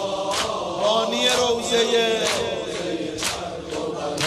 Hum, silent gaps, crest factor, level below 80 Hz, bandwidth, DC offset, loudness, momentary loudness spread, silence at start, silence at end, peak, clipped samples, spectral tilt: none; none; 16 dB; -54 dBFS; 13 kHz; under 0.1%; -22 LUFS; 9 LU; 0 s; 0 s; -6 dBFS; under 0.1%; -2.5 dB/octave